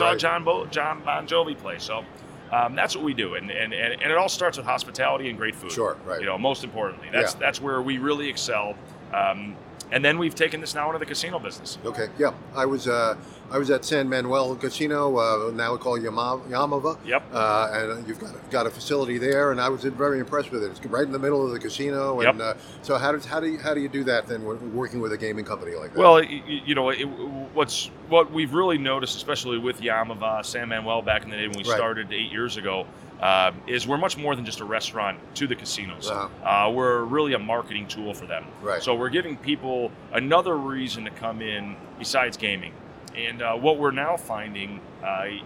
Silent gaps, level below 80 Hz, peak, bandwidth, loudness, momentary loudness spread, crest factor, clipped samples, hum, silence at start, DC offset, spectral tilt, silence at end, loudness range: none; -58 dBFS; 0 dBFS; 16.5 kHz; -25 LUFS; 10 LU; 24 dB; under 0.1%; none; 0 s; under 0.1%; -4 dB/octave; 0 s; 4 LU